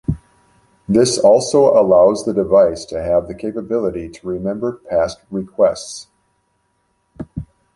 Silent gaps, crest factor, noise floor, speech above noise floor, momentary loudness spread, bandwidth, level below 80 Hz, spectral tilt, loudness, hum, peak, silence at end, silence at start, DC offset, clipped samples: none; 16 dB; -65 dBFS; 50 dB; 19 LU; 11.5 kHz; -42 dBFS; -5.5 dB/octave; -16 LUFS; none; 0 dBFS; 0.3 s; 0.1 s; under 0.1%; under 0.1%